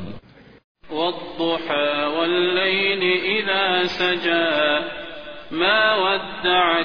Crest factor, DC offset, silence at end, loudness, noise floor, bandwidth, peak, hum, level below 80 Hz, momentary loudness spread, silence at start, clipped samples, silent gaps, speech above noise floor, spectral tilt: 18 dB; 0.7%; 0 s; -19 LUFS; -43 dBFS; 5.4 kHz; -4 dBFS; none; -56 dBFS; 13 LU; 0 s; under 0.1%; 0.64-0.75 s; 23 dB; -5 dB/octave